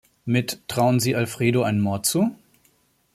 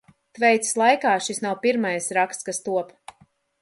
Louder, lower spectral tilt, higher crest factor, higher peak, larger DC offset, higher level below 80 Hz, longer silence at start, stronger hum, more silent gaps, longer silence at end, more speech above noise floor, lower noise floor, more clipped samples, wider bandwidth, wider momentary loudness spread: about the same, -22 LUFS vs -22 LUFS; first, -5 dB/octave vs -3 dB/octave; about the same, 18 dB vs 20 dB; about the same, -6 dBFS vs -4 dBFS; neither; first, -60 dBFS vs -72 dBFS; about the same, 0.25 s vs 0.35 s; neither; neither; about the same, 0.8 s vs 0.75 s; first, 42 dB vs 38 dB; about the same, -63 dBFS vs -60 dBFS; neither; first, 15.5 kHz vs 11.5 kHz; second, 5 LU vs 9 LU